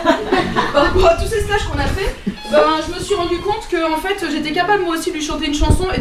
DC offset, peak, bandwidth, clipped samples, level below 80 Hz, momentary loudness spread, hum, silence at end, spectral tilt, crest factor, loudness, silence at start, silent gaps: under 0.1%; -2 dBFS; 15 kHz; under 0.1%; -26 dBFS; 7 LU; none; 0 s; -5 dB/octave; 14 dB; -17 LUFS; 0 s; none